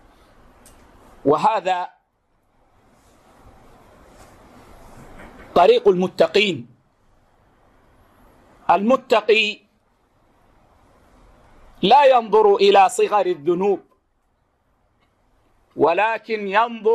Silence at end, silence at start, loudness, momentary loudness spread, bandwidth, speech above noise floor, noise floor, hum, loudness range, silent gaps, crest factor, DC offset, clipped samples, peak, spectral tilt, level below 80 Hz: 0 s; 1.25 s; -17 LUFS; 12 LU; 13.5 kHz; 49 dB; -65 dBFS; none; 8 LU; none; 16 dB; under 0.1%; under 0.1%; -4 dBFS; -4.5 dB/octave; -56 dBFS